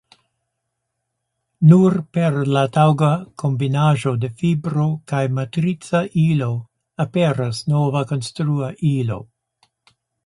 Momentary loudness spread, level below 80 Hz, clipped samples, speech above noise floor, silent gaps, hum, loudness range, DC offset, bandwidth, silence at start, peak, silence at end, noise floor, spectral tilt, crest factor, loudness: 8 LU; -56 dBFS; under 0.1%; 59 dB; none; none; 5 LU; under 0.1%; 11.5 kHz; 1.6 s; 0 dBFS; 1 s; -77 dBFS; -7.5 dB/octave; 18 dB; -19 LUFS